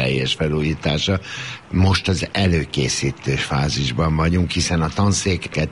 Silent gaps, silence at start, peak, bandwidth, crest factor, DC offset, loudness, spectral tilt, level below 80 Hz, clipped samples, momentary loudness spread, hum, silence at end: none; 0 s; -4 dBFS; 11.5 kHz; 14 dB; 0.1%; -20 LUFS; -5 dB/octave; -34 dBFS; under 0.1%; 4 LU; none; 0 s